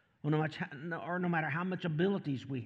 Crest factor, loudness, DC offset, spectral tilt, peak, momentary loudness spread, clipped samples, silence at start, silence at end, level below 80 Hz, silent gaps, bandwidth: 14 dB; -35 LUFS; under 0.1%; -8.5 dB/octave; -20 dBFS; 7 LU; under 0.1%; 0.25 s; 0 s; -80 dBFS; none; 7.8 kHz